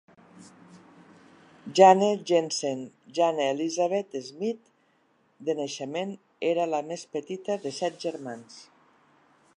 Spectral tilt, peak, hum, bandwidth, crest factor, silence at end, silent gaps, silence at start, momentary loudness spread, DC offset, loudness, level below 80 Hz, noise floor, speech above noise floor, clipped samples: -4.5 dB/octave; -4 dBFS; none; 11 kHz; 24 dB; 0.95 s; none; 0.35 s; 17 LU; under 0.1%; -27 LUFS; -84 dBFS; -67 dBFS; 41 dB; under 0.1%